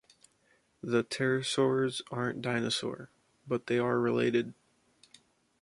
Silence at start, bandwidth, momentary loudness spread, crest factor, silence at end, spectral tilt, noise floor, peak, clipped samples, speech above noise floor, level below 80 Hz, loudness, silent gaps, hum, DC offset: 0.85 s; 11.5 kHz; 9 LU; 18 dB; 1.1 s; -5 dB/octave; -70 dBFS; -14 dBFS; under 0.1%; 40 dB; -72 dBFS; -31 LUFS; none; none; under 0.1%